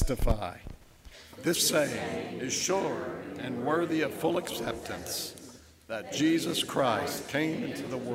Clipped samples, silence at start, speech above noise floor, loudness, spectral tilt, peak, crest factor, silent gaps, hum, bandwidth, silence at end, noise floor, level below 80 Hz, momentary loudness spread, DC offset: under 0.1%; 0 s; 21 dB; -30 LUFS; -3.5 dB/octave; -12 dBFS; 18 dB; none; none; 16 kHz; 0 s; -51 dBFS; -42 dBFS; 13 LU; under 0.1%